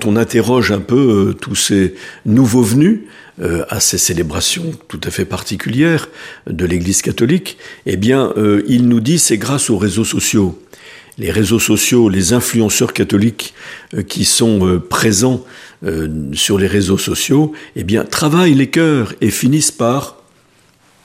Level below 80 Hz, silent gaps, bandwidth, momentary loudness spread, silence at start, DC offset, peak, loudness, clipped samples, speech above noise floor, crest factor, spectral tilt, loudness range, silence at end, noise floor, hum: -40 dBFS; none; 15.5 kHz; 11 LU; 0 s; under 0.1%; 0 dBFS; -13 LUFS; under 0.1%; 38 dB; 14 dB; -4.5 dB/octave; 3 LU; 0.95 s; -51 dBFS; none